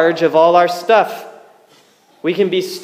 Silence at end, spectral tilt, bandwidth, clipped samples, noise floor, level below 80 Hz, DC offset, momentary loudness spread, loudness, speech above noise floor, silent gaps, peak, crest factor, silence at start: 0 s; -5 dB/octave; 15.5 kHz; under 0.1%; -51 dBFS; -72 dBFS; under 0.1%; 12 LU; -14 LUFS; 37 dB; none; 0 dBFS; 14 dB; 0 s